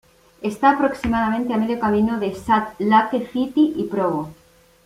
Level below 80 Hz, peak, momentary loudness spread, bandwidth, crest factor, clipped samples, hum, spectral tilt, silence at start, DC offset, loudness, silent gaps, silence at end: -48 dBFS; -2 dBFS; 8 LU; 14.5 kHz; 18 dB; under 0.1%; none; -6.5 dB/octave; 0.4 s; under 0.1%; -20 LUFS; none; 0.55 s